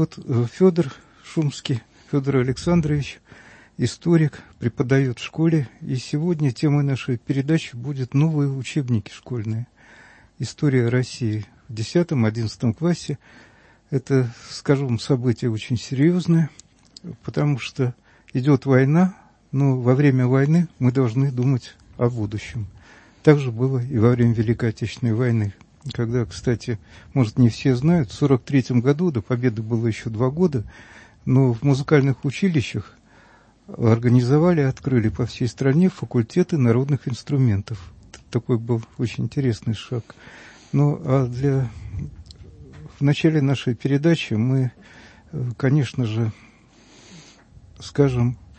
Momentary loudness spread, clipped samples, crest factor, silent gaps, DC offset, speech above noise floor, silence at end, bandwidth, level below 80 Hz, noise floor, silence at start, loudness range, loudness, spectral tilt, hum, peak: 12 LU; under 0.1%; 20 dB; none; under 0.1%; 32 dB; 0.25 s; 8.6 kHz; -50 dBFS; -52 dBFS; 0 s; 4 LU; -21 LUFS; -7.5 dB/octave; none; 0 dBFS